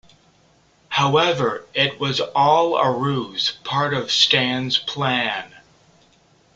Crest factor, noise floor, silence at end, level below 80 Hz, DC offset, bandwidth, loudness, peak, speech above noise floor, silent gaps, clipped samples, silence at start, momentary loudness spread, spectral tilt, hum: 20 dB; -57 dBFS; 0.95 s; -60 dBFS; under 0.1%; 9 kHz; -19 LUFS; -2 dBFS; 37 dB; none; under 0.1%; 0.9 s; 7 LU; -4 dB/octave; none